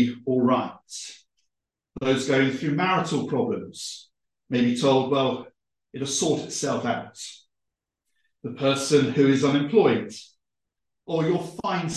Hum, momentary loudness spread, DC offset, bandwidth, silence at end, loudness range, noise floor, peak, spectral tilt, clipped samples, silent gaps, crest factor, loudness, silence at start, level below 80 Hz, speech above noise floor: none; 17 LU; under 0.1%; 12.5 kHz; 0 s; 5 LU; -85 dBFS; -6 dBFS; -5 dB/octave; under 0.1%; none; 18 dB; -24 LUFS; 0 s; -64 dBFS; 61 dB